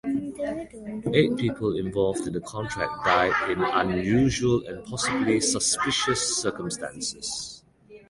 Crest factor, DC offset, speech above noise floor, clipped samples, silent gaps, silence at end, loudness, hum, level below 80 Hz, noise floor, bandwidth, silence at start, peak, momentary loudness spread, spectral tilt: 22 dB; under 0.1%; 26 dB; under 0.1%; none; 0.1 s; -25 LUFS; none; -50 dBFS; -51 dBFS; 11.5 kHz; 0.05 s; -4 dBFS; 10 LU; -4 dB/octave